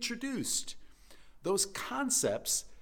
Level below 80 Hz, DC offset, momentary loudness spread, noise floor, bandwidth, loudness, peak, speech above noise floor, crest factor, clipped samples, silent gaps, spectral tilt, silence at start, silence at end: -60 dBFS; under 0.1%; 11 LU; -54 dBFS; 19 kHz; -32 LUFS; -16 dBFS; 20 dB; 18 dB; under 0.1%; none; -2 dB/octave; 0 s; 0 s